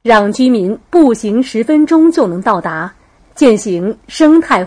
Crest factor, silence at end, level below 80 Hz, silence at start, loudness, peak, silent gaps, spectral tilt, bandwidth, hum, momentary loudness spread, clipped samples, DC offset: 10 dB; 0 s; -46 dBFS; 0.05 s; -11 LUFS; 0 dBFS; none; -5.5 dB/octave; 10.5 kHz; none; 9 LU; under 0.1%; under 0.1%